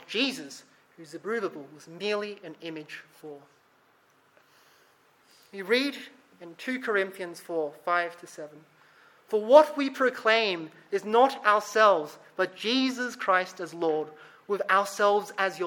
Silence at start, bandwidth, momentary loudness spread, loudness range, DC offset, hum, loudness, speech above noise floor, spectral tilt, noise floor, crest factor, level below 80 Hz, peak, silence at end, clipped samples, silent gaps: 0.1 s; 17.5 kHz; 22 LU; 14 LU; under 0.1%; none; -26 LUFS; 37 dB; -3.5 dB/octave; -64 dBFS; 24 dB; -86 dBFS; -4 dBFS; 0 s; under 0.1%; none